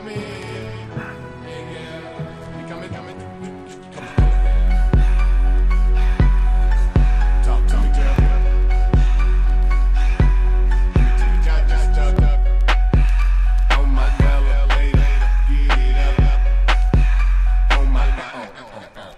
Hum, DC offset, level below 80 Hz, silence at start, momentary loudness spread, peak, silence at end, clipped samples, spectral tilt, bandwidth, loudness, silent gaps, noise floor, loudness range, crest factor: none; under 0.1%; -16 dBFS; 0 s; 15 LU; -2 dBFS; 0.05 s; under 0.1%; -6.5 dB/octave; 6 kHz; -18 LUFS; none; -37 dBFS; 7 LU; 12 dB